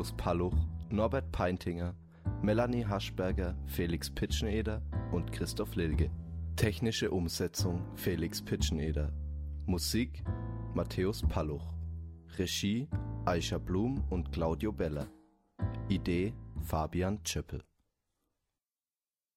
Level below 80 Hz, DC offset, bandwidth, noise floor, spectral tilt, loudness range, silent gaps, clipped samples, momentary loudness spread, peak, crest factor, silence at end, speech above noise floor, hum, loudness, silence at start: -42 dBFS; under 0.1%; 16 kHz; under -90 dBFS; -5.5 dB/octave; 2 LU; none; under 0.1%; 8 LU; -16 dBFS; 18 dB; 1.75 s; over 57 dB; none; -35 LUFS; 0 s